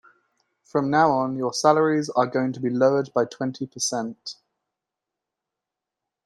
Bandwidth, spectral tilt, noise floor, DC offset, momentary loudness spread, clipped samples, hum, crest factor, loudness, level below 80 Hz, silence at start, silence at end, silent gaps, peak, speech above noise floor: 12.5 kHz; -4.5 dB/octave; -86 dBFS; under 0.1%; 10 LU; under 0.1%; none; 20 dB; -23 LUFS; -70 dBFS; 0.75 s; 1.9 s; none; -4 dBFS; 64 dB